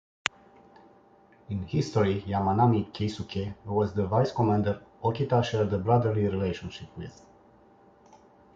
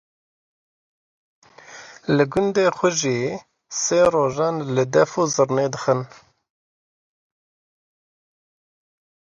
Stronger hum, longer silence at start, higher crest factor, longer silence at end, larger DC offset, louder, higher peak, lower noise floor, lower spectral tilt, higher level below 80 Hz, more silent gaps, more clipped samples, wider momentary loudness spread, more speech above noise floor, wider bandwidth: neither; second, 1.5 s vs 1.7 s; first, 26 dB vs 20 dB; second, 1.45 s vs 3.3 s; neither; second, -28 LUFS vs -20 LUFS; about the same, -2 dBFS vs -4 dBFS; first, -58 dBFS vs -43 dBFS; first, -7 dB/octave vs -4.5 dB/octave; first, -50 dBFS vs -58 dBFS; neither; neither; about the same, 13 LU vs 14 LU; first, 31 dB vs 23 dB; second, 7.8 kHz vs 10.5 kHz